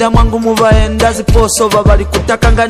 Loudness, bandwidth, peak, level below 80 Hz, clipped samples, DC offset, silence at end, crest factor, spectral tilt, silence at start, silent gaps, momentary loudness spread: -10 LUFS; 15.5 kHz; 0 dBFS; -14 dBFS; under 0.1%; under 0.1%; 0 s; 8 dB; -5 dB/octave; 0 s; none; 3 LU